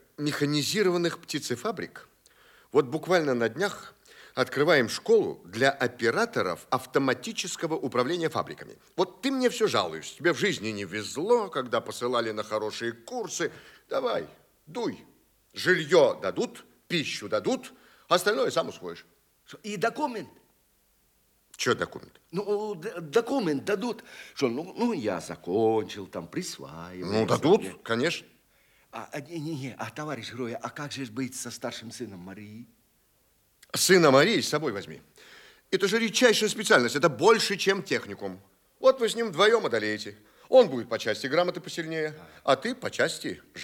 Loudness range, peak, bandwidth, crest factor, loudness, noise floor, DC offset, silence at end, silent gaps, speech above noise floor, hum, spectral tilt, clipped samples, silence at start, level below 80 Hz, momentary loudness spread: 9 LU; -6 dBFS; 18 kHz; 22 dB; -27 LUFS; -67 dBFS; under 0.1%; 0 s; none; 40 dB; none; -4 dB/octave; under 0.1%; 0.2 s; -74 dBFS; 16 LU